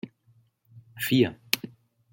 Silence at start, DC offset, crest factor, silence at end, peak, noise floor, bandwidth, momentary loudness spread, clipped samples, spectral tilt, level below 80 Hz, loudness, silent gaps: 0.05 s; under 0.1%; 28 dB; 0.45 s; -2 dBFS; -64 dBFS; 17 kHz; 22 LU; under 0.1%; -4.5 dB/octave; -68 dBFS; -26 LUFS; none